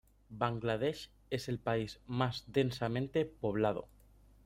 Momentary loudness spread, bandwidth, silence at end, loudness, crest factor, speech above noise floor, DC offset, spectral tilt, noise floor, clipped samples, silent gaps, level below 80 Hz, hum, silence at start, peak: 7 LU; 15.5 kHz; 0.6 s; -36 LUFS; 20 dB; 27 dB; under 0.1%; -6.5 dB/octave; -62 dBFS; under 0.1%; none; -62 dBFS; 50 Hz at -60 dBFS; 0.3 s; -16 dBFS